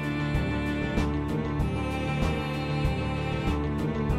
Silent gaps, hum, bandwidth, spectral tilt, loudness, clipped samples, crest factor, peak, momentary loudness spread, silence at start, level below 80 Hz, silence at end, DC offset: none; none; 13.5 kHz; -7 dB/octave; -29 LUFS; under 0.1%; 14 dB; -14 dBFS; 2 LU; 0 s; -34 dBFS; 0 s; under 0.1%